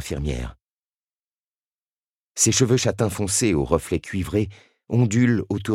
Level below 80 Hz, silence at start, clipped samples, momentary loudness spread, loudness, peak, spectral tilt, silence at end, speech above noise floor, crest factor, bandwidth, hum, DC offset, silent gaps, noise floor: -40 dBFS; 0 s; under 0.1%; 11 LU; -22 LUFS; -2 dBFS; -4.5 dB/octave; 0 s; over 69 dB; 20 dB; 15.5 kHz; none; under 0.1%; 0.66-1.10 s, 1.16-1.60 s, 1.67-2.35 s; under -90 dBFS